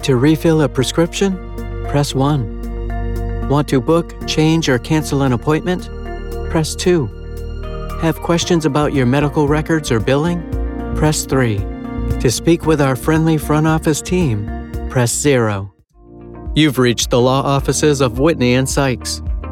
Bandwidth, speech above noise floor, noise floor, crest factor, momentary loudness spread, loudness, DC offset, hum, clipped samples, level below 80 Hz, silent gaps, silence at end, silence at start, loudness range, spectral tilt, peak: 17 kHz; 27 dB; -41 dBFS; 14 dB; 12 LU; -16 LUFS; under 0.1%; none; under 0.1%; -28 dBFS; none; 0 s; 0 s; 3 LU; -5.5 dB/octave; 0 dBFS